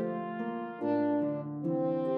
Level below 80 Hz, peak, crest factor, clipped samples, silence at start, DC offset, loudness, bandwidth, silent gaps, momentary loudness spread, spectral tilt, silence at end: -86 dBFS; -20 dBFS; 12 dB; under 0.1%; 0 s; under 0.1%; -33 LUFS; 4.7 kHz; none; 7 LU; -10.5 dB/octave; 0 s